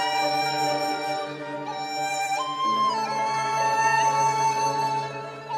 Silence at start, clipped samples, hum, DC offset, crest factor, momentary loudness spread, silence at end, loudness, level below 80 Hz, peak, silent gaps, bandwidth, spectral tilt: 0 s; under 0.1%; none; under 0.1%; 14 dB; 10 LU; 0 s; -25 LUFS; -72 dBFS; -10 dBFS; none; 14.5 kHz; -2.5 dB/octave